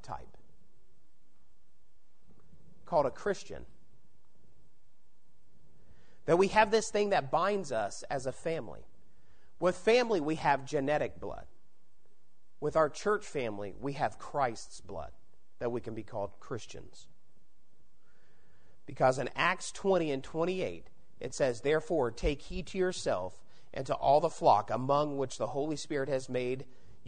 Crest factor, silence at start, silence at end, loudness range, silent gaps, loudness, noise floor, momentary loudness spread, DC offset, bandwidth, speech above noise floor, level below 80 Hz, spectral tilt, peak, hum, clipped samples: 22 dB; 0.05 s; 0.45 s; 9 LU; none; -32 LUFS; -75 dBFS; 17 LU; 0.7%; 9.6 kHz; 43 dB; -56 dBFS; -5 dB/octave; -12 dBFS; none; under 0.1%